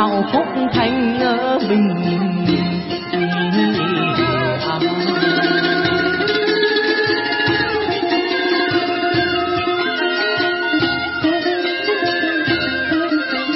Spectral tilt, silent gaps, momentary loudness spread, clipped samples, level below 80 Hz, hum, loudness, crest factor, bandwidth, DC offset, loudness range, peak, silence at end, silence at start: -9 dB/octave; none; 3 LU; under 0.1%; -48 dBFS; none; -17 LUFS; 14 dB; 5.8 kHz; under 0.1%; 1 LU; -4 dBFS; 0 s; 0 s